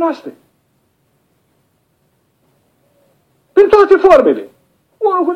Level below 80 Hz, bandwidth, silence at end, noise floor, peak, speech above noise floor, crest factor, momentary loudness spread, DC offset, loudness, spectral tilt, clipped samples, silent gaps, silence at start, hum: -50 dBFS; 7.8 kHz; 0 s; -60 dBFS; 0 dBFS; 50 dB; 14 dB; 16 LU; under 0.1%; -10 LUFS; -5.5 dB/octave; under 0.1%; none; 0 s; none